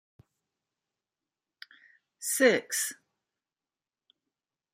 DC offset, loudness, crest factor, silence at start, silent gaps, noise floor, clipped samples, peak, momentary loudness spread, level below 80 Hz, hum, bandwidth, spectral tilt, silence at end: under 0.1%; -27 LUFS; 26 dB; 2.2 s; none; under -90 dBFS; under 0.1%; -8 dBFS; 11 LU; -86 dBFS; none; 15.5 kHz; -2 dB/octave; 1.8 s